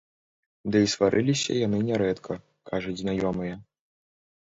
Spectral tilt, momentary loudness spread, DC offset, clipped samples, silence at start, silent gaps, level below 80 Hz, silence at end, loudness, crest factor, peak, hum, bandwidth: -5 dB/octave; 15 LU; under 0.1%; under 0.1%; 0.65 s; none; -56 dBFS; 0.95 s; -26 LUFS; 18 dB; -8 dBFS; none; 8 kHz